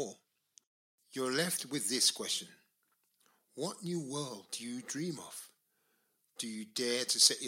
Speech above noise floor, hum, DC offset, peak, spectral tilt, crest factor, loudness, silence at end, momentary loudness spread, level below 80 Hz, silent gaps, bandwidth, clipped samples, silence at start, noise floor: 43 dB; none; under 0.1%; -12 dBFS; -2 dB/octave; 26 dB; -34 LUFS; 0 s; 18 LU; -88 dBFS; 0.67-0.98 s; 16.5 kHz; under 0.1%; 0 s; -78 dBFS